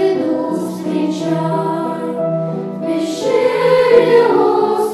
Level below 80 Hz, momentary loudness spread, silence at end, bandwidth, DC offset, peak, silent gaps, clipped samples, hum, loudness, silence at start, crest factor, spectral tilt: -60 dBFS; 10 LU; 0 s; 13 kHz; under 0.1%; 0 dBFS; none; under 0.1%; none; -15 LUFS; 0 s; 14 dB; -6.5 dB/octave